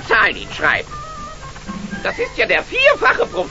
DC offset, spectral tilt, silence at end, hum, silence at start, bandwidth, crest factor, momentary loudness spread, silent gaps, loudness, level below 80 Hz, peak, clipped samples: 0.6%; -3.5 dB/octave; 0 s; none; 0 s; 8 kHz; 18 dB; 18 LU; none; -16 LUFS; -38 dBFS; 0 dBFS; under 0.1%